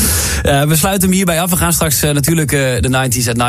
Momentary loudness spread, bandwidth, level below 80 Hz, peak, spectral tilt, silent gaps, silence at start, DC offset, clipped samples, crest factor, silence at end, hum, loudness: 2 LU; 16 kHz; -26 dBFS; 0 dBFS; -4 dB/octave; none; 0 s; under 0.1%; under 0.1%; 12 dB; 0 s; none; -12 LUFS